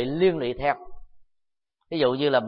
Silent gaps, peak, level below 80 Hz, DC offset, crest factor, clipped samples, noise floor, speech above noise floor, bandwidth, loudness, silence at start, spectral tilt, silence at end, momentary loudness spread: none; -8 dBFS; -50 dBFS; under 0.1%; 18 dB; under 0.1%; -77 dBFS; 54 dB; 5.2 kHz; -25 LUFS; 0 s; -10.5 dB/octave; 0 s; 10 LU